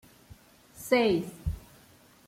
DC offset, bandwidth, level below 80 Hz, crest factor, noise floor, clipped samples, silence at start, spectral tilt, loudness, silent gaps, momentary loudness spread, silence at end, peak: under 0.1%; 16.5 kHz; -48 dBFS; 20 dB; -58 dBFS; under 0.1%; 0.3 s; -5.5 dB/octave; -28 LUFS; none; 20 LU; 0.7 s; -10 dBFS